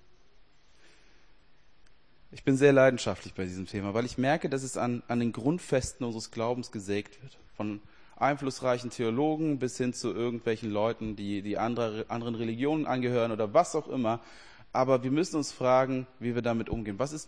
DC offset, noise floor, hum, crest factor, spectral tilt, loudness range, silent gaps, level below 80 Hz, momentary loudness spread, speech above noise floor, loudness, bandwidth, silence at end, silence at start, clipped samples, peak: 0.2%; -63 dBFS; none; 22 dB; -6 dB/octave; 5 LU; none; -56 dBFS; 10 LU; 33 dB; -30 LUFS; 10.5 kHz; 0.05 s; 2.3 s; under 0.1%; -8 dBFS